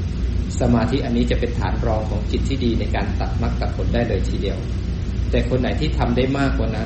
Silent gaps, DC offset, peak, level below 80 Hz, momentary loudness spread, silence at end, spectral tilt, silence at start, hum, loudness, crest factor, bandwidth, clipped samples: none; under 0.1%; -6 dBFS; -24 dBFS; 5 LU; 0 s; -7 dB/octave; 0 s; none; -21 LUFS; 14 dB; 8.4 kHz; under 0.1%